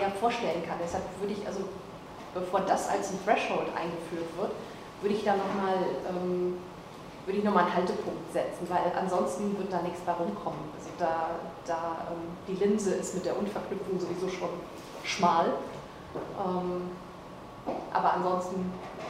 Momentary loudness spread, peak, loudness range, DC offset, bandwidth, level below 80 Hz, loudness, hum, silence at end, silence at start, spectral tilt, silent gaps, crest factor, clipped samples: 13 LU; -10 dBFS; 2 LU; under 0.1%; 15.5 kHz; -60 dBFS; -31 LUFS; none; 0 s; 0 s; -5.5 dB/octave; none; 20 dB; under 0.1%